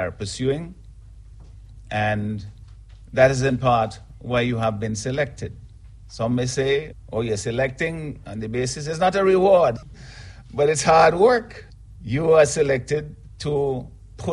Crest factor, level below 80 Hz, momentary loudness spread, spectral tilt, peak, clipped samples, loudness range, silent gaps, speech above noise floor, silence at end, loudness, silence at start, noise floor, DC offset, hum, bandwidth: 18 dB; -44 dBFS; 21 LU; -5.5 dB/octave; -4 dBFS; under 0.1%; 6 LU; none; 22 dB; 0 s; -21 LUFS; 0 s; -43 dBFS; under 0.1%; none; 11.5 kHz